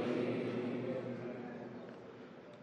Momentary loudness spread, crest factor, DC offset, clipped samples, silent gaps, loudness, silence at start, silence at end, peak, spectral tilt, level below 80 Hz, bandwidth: 16 LU; 16 dB; under 0.1%; under 0.1%; none; -41 LUFS; 0 s; 0 s; -24 dBFS; -7.5 dB/octave; -84 dBFS; 9.4 kHz